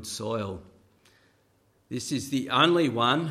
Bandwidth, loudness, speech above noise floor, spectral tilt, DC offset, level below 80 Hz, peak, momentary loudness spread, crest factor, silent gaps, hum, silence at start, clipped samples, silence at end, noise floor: 14.5 kHz; -26 LUFS; 40 dB; -4.5 dB/octave; under 0.1%; -64 dBFS; -6 dBFS; 16 LU; 22 dB; none; none; 0 s; under 0.1%; 0 s; -66 dBFS